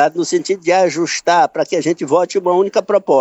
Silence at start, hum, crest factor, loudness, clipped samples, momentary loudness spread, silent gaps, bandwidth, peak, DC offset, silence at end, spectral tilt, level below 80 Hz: 0 s; none; 12 dB; -15 LUFS; under 0.1%; 4 LU; none; 8.4 kHz; -2 dBFS; under 0.1%; 0 s; -4 dB/octave; -68 dBFS